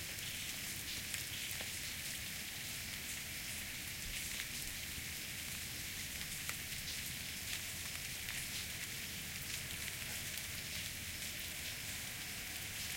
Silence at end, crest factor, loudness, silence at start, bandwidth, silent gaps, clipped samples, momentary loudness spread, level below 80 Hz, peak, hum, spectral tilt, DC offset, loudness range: 0 s; 24 dB; -42 LUFS; 0 s; 17 kHz; none; under 0.1%; 2 LU; -60 dBFS; -20 dBFS; none; -1 dB/octave; under 0.1%; 0 LU